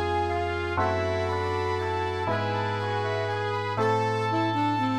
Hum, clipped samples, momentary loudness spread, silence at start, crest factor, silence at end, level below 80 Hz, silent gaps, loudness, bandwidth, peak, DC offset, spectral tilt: none; under 0.1%; 3 LU; 0 s; 14 dB; 0 s; -52 dBFS; none; -27 LUFS; 11.5 kHz; -14 dBFS; 0.2%; -6.5 dB/octave